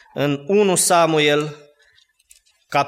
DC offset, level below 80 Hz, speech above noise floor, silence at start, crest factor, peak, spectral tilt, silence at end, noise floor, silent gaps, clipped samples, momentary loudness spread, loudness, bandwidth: under 0.1%; -68 dBFS; 40 dB; 0.15 s; 16 dB; -4 dBFS; -3.5 dB/octave; 0 s; -58 dBFS; none; under 0.1%; 8 LU; -17 LUFS; 16 kHz